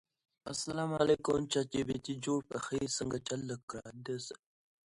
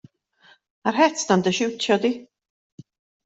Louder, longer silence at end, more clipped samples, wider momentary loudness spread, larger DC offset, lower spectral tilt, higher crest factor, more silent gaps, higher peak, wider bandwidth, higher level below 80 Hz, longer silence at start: second, -36 LUFS vs -21 LUFS; second, 0.5 s vs 1 s; neither; first, 14 LU vs 8 LU; neither; about the same, -4.5 dB/octave vs -4 dB/octave; about the same, 20 dB vs 20 dB; first, 3.63-3.68 s vs none; second, -16 dBFS vs -4 dBFS; first, 11.5 kHz vs 8.2 kHz; about the same, -64 dBFS vs -68 dBFS; second, 0.45 s vs 0.85 s